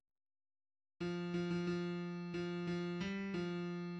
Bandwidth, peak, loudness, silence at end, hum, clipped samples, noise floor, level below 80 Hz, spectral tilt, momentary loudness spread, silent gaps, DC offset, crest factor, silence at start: 7.8 kHz; -28 dBFS; -41 LUFS; 0 s; none; under 0.1%; under -90 dBFS; -70 dBFS; -7 dB/octave; 4 LU; none; under 0.1%; 14 dB; 1 s